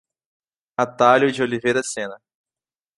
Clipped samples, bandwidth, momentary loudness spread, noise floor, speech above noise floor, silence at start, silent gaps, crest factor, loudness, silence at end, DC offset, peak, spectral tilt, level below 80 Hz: under 0.1%; 11.5 kHz; 15 LU; under -90 dBFS; over 71 dB; 0.8 s; none; 20 dB; -19 LUFS; 0.8 s; under 0.1%; -2 dBFS; -4 dB/octave; -66 dBFS